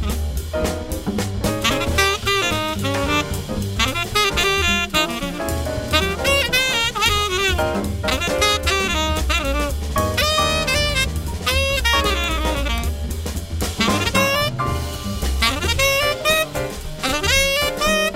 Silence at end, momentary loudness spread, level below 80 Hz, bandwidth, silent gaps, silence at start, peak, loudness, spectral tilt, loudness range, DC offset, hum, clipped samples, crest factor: 0 s; 8 LU; -28 dBFS; 16.5 kHz; none; 0 s; -2 dBFS; -19 LUFS; -3.5 dB/octave; 2 LU; under 0.1%; none; under 0.1%; 18 dB